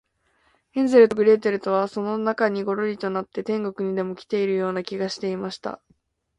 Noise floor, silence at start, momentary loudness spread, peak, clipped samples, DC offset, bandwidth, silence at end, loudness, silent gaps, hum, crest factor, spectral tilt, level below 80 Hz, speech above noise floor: -66 dBFS; 0.75 s; 13 LU; -2 dBFS; under 0.1%; under 0.1%; 10.5 kHz; 0.65 s; -23 LUFS; none; none; 20 dB; -6.5 dB/octave; -66 dBFS; 43 dB